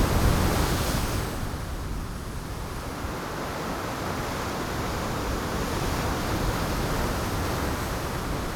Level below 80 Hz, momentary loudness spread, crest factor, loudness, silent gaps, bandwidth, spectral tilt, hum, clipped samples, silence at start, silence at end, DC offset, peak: -34 dBFS; 9 LU; 18 dB; -29 LUFS; none; over 20 kHz; -5 dB/octave; none; under 0.1%; 0 s; 0 s; under 0.1%; -10 dBFS